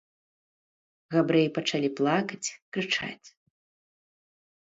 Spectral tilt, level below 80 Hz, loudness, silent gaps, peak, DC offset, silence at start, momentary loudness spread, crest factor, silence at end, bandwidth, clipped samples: -4.5 dB/octave; -74 dBFS; -27 LUFS; 2.62-2.72 s; -10 dBFS; under 0.1%; 1.1 s; 11 LU; 20 dB; 1.4 s; 8 kHz; under 0.1%